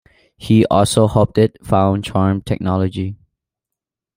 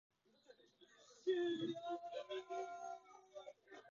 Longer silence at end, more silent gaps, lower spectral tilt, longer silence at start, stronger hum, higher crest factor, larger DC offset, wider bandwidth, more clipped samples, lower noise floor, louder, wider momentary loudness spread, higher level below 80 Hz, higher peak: first, 1 s vs 0 s; neither; first, -6.5 dB/octave vs -3.5 dB/octave; about the same, 0.4 s vs 0.5 s; neither; about the same, 16 dB vs 18 dB; neither; first, 16 kHz vs 7.2 kHz; neither; first, -84 dBFS vs -70 dBFS; first, -16 LUFS vs -45 LUFS; second, 9 LU vs 21 LU; first, -44 dBFS vs under -90 dBFS; first, -2 dBFS vs -30 dBFS